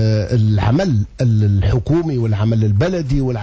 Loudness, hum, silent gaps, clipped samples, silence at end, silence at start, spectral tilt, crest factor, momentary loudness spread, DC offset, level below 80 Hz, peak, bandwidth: -16 LUFS; none; none; under 0.1%; 0 s; 0 s; -8.5 dB/octave; 8 dB; 4 LU; under 0.1%; -30 dBFS; -6 dBFS; 7.6 kHz